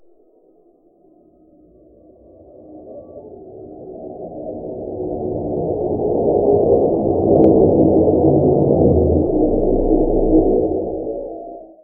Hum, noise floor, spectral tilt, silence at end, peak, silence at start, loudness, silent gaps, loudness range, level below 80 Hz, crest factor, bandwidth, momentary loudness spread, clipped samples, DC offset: none; -53 dBFS; -15.5 dB/octave; 0.2 s; 0 dBFS; 2.7 s; -16 LUFS; none; 18 LU; -32 dBFS; 18 dB; 1.4 kHz; 23 LU; under 0.1%; under 0.1%